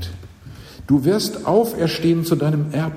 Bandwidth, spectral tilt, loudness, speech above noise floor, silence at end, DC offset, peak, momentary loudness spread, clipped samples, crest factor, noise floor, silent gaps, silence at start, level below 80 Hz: 16 kHz; -6.5 dB/octave; -19 LUFS; 21 dB; 0 s; under 0.1%; -4 dBFS; 20 LU; under 0.1%; 16 dB; -39 dBFS; none; 0 s; -46 dBFS